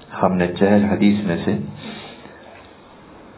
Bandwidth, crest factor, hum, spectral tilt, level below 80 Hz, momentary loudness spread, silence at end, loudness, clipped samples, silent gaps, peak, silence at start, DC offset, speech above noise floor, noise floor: 4 kHz; 20 dB; none; -11.5 dB/octave; -46 dBFS; 22 LU; 0.2 s; -18 LUFS; under 0.1%; none; 0 dBFS; 0 s; under 0.1%; 26 dB; -44 dBFS